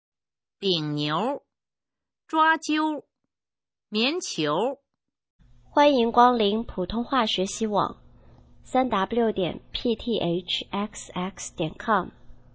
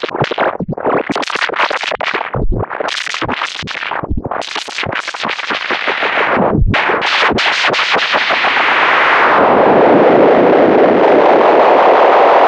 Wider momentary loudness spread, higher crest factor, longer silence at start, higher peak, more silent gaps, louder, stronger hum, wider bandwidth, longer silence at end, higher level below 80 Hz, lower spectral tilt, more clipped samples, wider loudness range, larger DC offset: about the same, 12 LU vs 11 LU; first, 22 dB vs 12 dB; first, 0.6 s vs 0 s; second, -4 dBFS vs 0 dBFS; first, 5.30-5.39 s vs none; second, -25 LUFS vs -12 LUFS; neither; second, 8 kHz vs 10.5 kHz; first, 0.2 s vs 0 s; second, -52 dBFS vs -28 dBFS; about the same, -4.5 dB/octave vs -5 dB/octave; neither; second, 4 LU vs 10 LU; neither